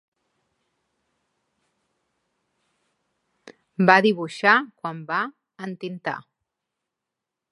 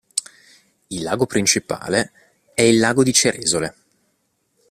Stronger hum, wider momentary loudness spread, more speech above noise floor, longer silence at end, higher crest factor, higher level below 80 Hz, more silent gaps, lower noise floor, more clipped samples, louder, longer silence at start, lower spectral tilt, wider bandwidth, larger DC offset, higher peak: neither; first, 20 LU vs 14 LU; first, 63 dB vs 50 dB; first, 1.3 s vs 1 s; first, 26 dB vs 20 dB; second, -78 dBFS vs -54 dBFS; neither; first, -85 dBFS vs -68 dBFS; neither; second, -21 LUFS vs -18 LUFS; first, 3.8 s vs 0.15 s; first, -6 dB/octave vs -3 dB/octave; second, 11 kHz vs 15 kHz; neither; about the same, 0 dBFS vs 0 dBFS